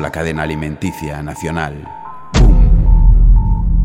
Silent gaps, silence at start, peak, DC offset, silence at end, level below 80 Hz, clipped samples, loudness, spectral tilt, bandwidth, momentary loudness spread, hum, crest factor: none; 0 s; 0 dBFS; under 0.1%; 0 s; -12 dBFS; under 0.1%; -15 LUFS; -7 dB/octave; 9.6 kHz; 13 LU; none; 10 dB